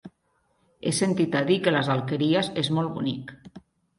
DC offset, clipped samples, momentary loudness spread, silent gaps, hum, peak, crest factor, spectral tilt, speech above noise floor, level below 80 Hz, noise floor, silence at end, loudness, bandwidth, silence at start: under 0.1%; under 0.1%; 9 LU; none; none; -8 dBFS; 18 dB; -5 dB/octave; 45 dB; -64 dBFS; -70 dBFS; 0.4 s; -25 LUFS; 11.5 kHz; 0.05 s